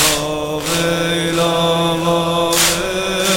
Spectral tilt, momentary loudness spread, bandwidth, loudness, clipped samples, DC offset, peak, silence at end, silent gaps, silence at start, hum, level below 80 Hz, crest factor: -3 dB/octave; 5 LU; 19 kHz; -16 LUFS; under 0.1%; under 0.1%; -2 dBFS; 0 s; none; 0 s; none; -40 dBFS; 16 dB